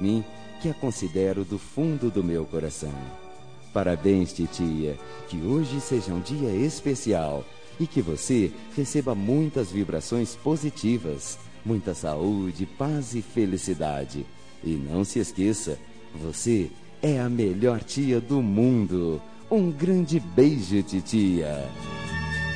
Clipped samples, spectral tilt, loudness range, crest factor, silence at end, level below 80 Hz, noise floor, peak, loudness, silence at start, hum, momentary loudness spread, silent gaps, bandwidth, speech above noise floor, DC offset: under 0.1%; -6.5 dB/octave; 5 LU; 20 dB; 0 s; -50 dBFS; -46 dBFS; -6 dBFS; -26 LUFS; 0 s; none; 11 LU; none; 10 kHz; 21 dB; 0.7%